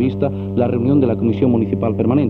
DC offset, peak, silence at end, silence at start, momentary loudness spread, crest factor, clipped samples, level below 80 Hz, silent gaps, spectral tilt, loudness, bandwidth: under 0.1%; -2 dBFS; 0 s; 0 s; 4 LU; 14 dB; under 0.1%; -48 dBFS; none; -11.5 dB/octave; -17 LUFS; 4.4 kHz